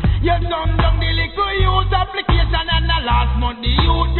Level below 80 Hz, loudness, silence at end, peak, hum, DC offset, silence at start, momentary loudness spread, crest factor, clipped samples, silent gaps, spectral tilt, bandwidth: -18 dBFS; -17 LUFS; 0 s; -2 dBFS; none; under 0.1%; 0 s; 3 LU; 14 dB; under 0.1%; none; -11 dB/octave; 4.3 kHz